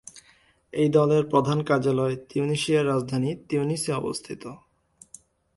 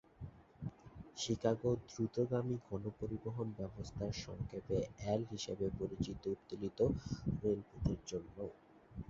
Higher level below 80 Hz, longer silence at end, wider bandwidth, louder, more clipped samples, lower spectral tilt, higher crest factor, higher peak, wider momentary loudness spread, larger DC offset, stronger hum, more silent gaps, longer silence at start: second, -62 dBFS vs -56 dBFS; first, 1 s vs 0 s; first, 11.5 kHz vs 7.8 kHz; first, -24 LUFS vs -41 LUFS; neither; about the same, -6 dB/octave vs -7 dB/octave; about the same, 20 dB vs 22 dB; first, -6 dBFS vs -18 dBFS; about the same, 14 LU vs 13 LU; neither; neither; neither; about the same, 0.15 s vs 0.2 s